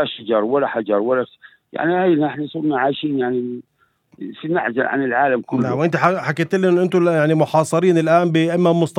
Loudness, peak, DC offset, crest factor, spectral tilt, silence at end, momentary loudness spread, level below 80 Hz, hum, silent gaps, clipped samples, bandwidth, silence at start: -18 LUFS; 0 dBFS; under 0.1%; 18 dB; -7 dB/octave; 0 s; 7 LU; -68 dBFS; none; none; under 0.1%; 12 kHz; 0 s